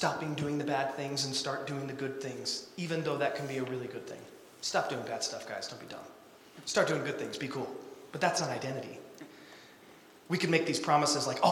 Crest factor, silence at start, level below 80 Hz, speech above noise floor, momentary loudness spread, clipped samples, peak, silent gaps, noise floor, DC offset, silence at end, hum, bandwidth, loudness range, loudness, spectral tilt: 24 dB; 0 s; -74 dBFS; 23 dB; 19 LU; under 0.1%; -10 dBFS; none; -56 dBFS; under 0.1%; 0 s; none; 18 kHz; 4 LU; -33 LUFS; -4 dB/octave